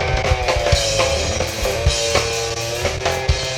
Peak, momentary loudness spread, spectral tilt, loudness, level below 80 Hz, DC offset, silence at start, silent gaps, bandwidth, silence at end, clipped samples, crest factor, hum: -2 dBFS; 4 LU; -3 dB/octave; -18 LUFS; -26 dBFS; under 0.1%; 0 s; none; 17.5 kHz; 0 s; under 0.1%; 18 dB; none